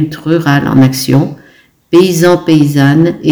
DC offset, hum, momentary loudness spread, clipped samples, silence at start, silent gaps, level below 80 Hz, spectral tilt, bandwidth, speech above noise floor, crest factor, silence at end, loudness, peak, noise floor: under 0.1%; none; 4 LU; 3%; 0 s; none; -44 dBFS; -6.5 dB/octave; over 20 kHz; 36 dB; 10 dB; 0 s; -9 LUFS; 0 dBFS; -44 dBFS